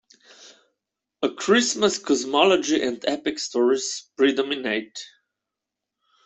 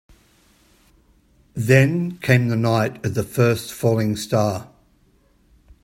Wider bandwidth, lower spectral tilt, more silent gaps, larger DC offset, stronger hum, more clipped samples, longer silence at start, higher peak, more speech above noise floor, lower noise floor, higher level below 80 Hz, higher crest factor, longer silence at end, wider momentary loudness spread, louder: second, 8.4 kHz vs 16.5 kHz; second, -2.5 dB/octave vs -6.5 dB/octave; neither; neither; neither; neither; second, 0.4 s vs 1.55 s; second, -4 dBFS vs 0 dBFS; first, 63 dB vs 39 dB; first, -85 dBFS vs -58 dBFS; second, -68 dBFS vs -54 dBFS; about the same, 20 dB vs 22 dB; about the same, 1.2 s vs 1.2 s; about the same, 10 LU vs 9 LU; about the same, -22 LUFS vs -20 LUFS